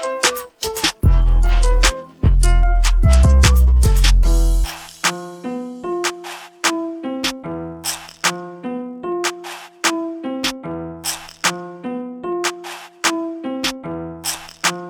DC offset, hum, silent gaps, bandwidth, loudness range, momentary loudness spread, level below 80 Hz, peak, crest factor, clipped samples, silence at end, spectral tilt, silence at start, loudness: under 0.1%; none; none; 18 kHz; 8 LU; 14 LU; -18 dBFS; 0 dBFS; 16 dB; under 0.1%; 0 s; -4 dB/octave; 0 s; -19 LUFS